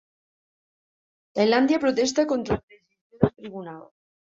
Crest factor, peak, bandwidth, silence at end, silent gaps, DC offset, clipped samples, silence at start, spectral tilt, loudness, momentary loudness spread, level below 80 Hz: 22 dB; -4 dBFS; 7.8 kHz; 0.55 s; 2.63-2.68 s, 3.01-3.10 s; under 0.1%; under 0.1%; 1.35 s; -5.5 dB/octave; -23 LUFS; 18 LU; -52 dBFS